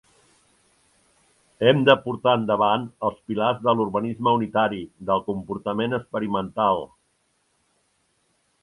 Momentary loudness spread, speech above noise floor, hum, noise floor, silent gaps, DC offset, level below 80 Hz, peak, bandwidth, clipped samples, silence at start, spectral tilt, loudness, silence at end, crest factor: 10 LU; 47 dB; none; -69 dBFS; none; under 0.1%; -60 dBFS; 0 dBFS; 11.5 kHz; under 0.1%; 1.6 s; -7.5 dB/octave; -23 LUFS; 1.75 s; 24 dB